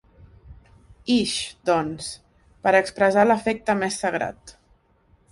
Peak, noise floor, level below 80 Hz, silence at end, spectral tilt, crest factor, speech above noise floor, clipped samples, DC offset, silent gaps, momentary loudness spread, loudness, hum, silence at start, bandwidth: -4 dBFS; -61 dBFS; -54 dBFS; 0.8 s; -4 dB/octave; 20 dB; 39 dB; under 0.1%; under 0.1%; none; 14 LU; -22 LUFS; none; 0.45 s; 11.5 kHz